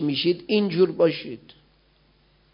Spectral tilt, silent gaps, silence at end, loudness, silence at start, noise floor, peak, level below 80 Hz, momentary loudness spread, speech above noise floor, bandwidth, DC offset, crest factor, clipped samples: -10.5 dB/octave; none; 1.15 s; -22 LUFS; 0 s; -61 dBFS; -8 dBFS; -64 dBFS; 17 LU; 38 dB; 5.4 kHz; under 0.1%; 18 dB; under 0.1%